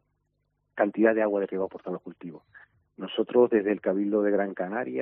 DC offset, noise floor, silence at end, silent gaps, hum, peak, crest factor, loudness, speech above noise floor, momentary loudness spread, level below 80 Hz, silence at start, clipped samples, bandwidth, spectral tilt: under 0.1%; -76 dBFS; 0 s; none; none; -6 dBFS; 20 dB; -26 LUFS; 49 dB; 19 LU; -72 dBFS; 0.75 s; under 0.1%; 3.8 kHz; -5 dB/octave